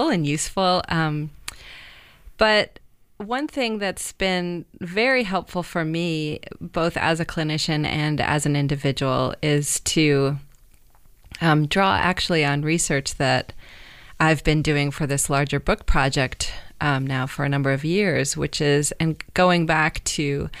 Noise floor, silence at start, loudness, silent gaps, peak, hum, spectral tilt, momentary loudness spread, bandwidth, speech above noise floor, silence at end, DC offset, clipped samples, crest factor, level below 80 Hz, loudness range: -51 dBFS; 0 s; -22 LUFS; none; -6 dBFS; none; -4.5 dB/octave; 10 LU; 15.5 kHz; 29 dB; 0 s; under 0.1%; under 0.1%; 18 dB; -38 dBFS; 3 LU